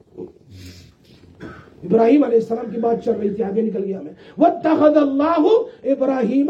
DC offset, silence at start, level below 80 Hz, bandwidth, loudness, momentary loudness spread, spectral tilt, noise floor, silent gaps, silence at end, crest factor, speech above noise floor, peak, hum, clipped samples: under 0.1%; 0.15 s; -60 dBFS; 7.6 kHz; -18 LUFS; 23 LU; -8 dB/octave; -48 dBFS; none; 0 s; 16 dB; 31 dB; -2 dBFS; none; under 0.1%